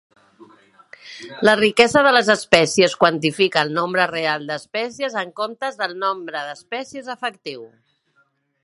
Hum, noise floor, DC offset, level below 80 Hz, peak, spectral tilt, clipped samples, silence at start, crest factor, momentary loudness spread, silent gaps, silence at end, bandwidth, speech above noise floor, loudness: none; -64 dBFS; under 0.1%; -60 dBFS; 0 dBFS; -3.5 dB/octave; under 0.1%; 0.4 s; 20 dB; 16 LU; none; 0.95 s; 11.5 kHz; 44 dB; -19 LUFS